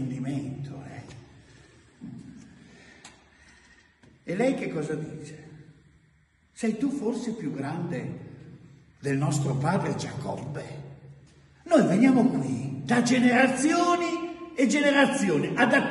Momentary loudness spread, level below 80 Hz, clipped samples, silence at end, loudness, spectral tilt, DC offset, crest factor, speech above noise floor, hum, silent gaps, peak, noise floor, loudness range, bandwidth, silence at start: 23 LU; -62 dBFS; under 0.1%; 0 s; -25 LUFS; -5.5 dB/octave; under 0.1%; 20 dB; 39 dB; none; none; -8 dBFS; -63 dBFS; 12 LU; 11.5 kHz; 0 s